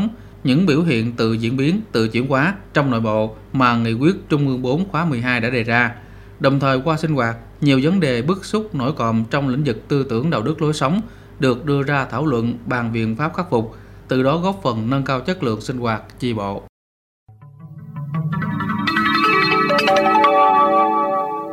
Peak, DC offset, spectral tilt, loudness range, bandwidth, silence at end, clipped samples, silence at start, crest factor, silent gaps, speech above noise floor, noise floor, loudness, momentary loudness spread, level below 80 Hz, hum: 0 dBFS; under 0.1%; -6.5 dB/octave; 6 LU; 15.5 kHz; 0 s; under 0.1%; 0 s; 18 dB; 16.69-17.26 s; 21 dB; -40 dBFS; -18 LUFS; 9 LU; -46 dBFS; none